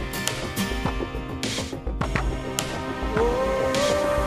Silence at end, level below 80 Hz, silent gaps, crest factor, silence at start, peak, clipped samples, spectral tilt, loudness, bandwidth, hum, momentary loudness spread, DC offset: 0 s; -34 dBFS; none; 22 dB; 0 s; -4 dBFS; under 0.1%; -4.5 dB/octave; -26 LUFS; 15.5 kHz; none; 7 LU; under 0.1%